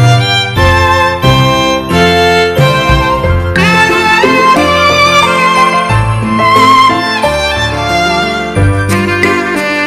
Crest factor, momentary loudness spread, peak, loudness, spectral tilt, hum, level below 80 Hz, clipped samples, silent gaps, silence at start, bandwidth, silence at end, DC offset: 8 dB; 5 LU; 0 dBFS; -8 LUFS; -5 dB/octave; none; -24 dBFS; 0.6%; none; 0 s; 15 kHz; 0 s; under 0.1%